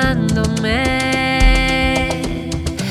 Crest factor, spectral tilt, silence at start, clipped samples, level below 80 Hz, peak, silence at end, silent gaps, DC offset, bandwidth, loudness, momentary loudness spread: 16 dB; -5 dB/octave; 0 s; under 0.1%; -22 dBFS; 0 dBFS; 0 s; none; under 0.1%; 14 kHz; -16 LUFS; 8 LU